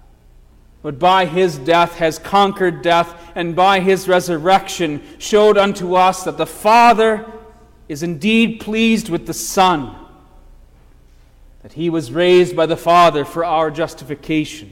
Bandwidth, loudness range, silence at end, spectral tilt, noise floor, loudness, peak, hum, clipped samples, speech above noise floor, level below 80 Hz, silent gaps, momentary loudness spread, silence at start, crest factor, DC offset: 17 kHz; 5 LU; 0.05 s; -4.5 dB/octave; -46 dBFS; -15 LUFS; -2 dBFS; none; under 0.1%; 31 dB; -44 dBFS; none; 12 LU; 0.85 s; 14 dB; under 0.1%